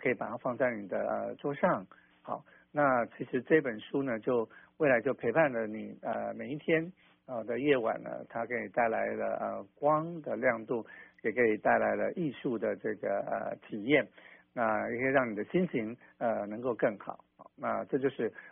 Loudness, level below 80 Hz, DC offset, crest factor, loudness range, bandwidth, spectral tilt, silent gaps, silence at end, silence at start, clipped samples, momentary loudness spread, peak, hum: -32 LUFS; -72 dBFS; under 0.1%; 20 dB; 2 LU; 3.7 kHz; -1.5 dB/octave; none; 0 s; 0 s; under 0.1%; 11 LU; -12 dBFS; none